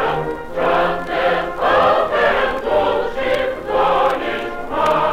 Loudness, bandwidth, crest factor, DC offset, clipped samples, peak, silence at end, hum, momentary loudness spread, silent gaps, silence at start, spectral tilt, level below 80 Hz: -18 LUFS; 15.5 kHz; 12 dB; under 0.1%; under 0.1%; -4 dBFS; 0 s; none; 7 LU; none; 0 s; -5 dB/octave; -40 dBFS